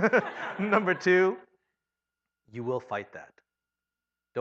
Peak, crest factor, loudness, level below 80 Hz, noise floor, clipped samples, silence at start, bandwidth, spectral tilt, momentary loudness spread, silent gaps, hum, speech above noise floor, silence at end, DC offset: -8 dBFS; 22 dB; -27 LUFS; -80 dBFS; -89 dBFS; under 0.1%; 0 s; 7.6 kHz; -6.5 dB/octave; 21 LU; none; none; 62 dB; 0 s; under 0.1%